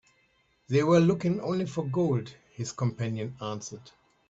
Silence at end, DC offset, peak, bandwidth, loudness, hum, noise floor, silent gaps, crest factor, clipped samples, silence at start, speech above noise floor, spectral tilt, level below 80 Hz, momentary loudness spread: 0.4 s; under 0.1%; -10 dBFS; 8 kHz; -28 LUFS; none; -68 dBFS; none; 18 dB; under 0.1%; 0.7 s; 41 dB; -7 dB/octave; -64 dBFS; 16 LU